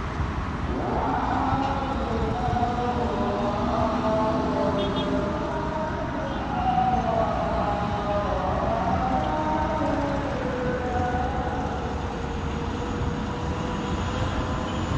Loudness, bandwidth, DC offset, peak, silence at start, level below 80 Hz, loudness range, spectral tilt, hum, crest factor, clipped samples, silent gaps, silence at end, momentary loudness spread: -26 LUFS; 10.5 kHz; under 0.1%; -12 dBFS; 0 s; -36 dBFS; 3 LU; -7 dB/octave; none; 14 dB; under 0.1%; none; 0 s; 5 LU